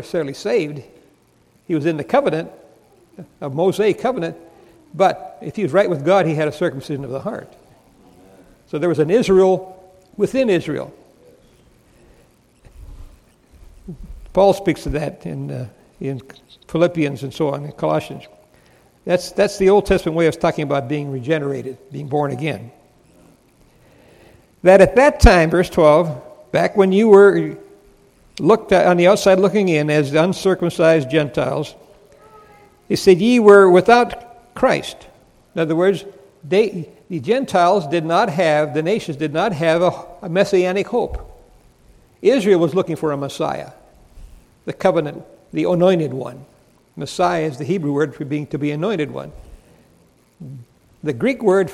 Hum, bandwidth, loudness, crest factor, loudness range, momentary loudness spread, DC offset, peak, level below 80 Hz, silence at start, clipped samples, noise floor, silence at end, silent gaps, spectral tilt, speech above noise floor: none; 14.5 kHz; -17 LUFS; 18 dB; 9 LU; 19 LU; under 0.1%; 0 dBFS; -36 dBFS; 0 s; under 0.1%; -56 dBFS; 0 s; none; -6.5 dB/octave; 40 dB